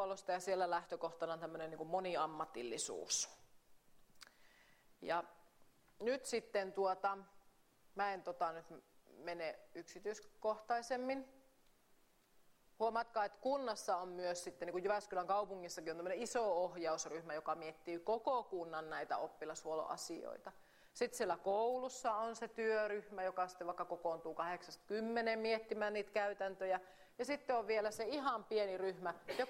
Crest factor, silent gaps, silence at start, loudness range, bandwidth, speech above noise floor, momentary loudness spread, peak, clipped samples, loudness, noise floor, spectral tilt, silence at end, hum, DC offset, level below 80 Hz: 18 dB; none; 0 s; 5 LU; 16 kHz; 30 dB; 9 LU; -26 dBFS; under 0.1%; -42 LUFS; -72 dBFS; -3 dB/octave; 0 s; none; under 0.1%; -78 dBFS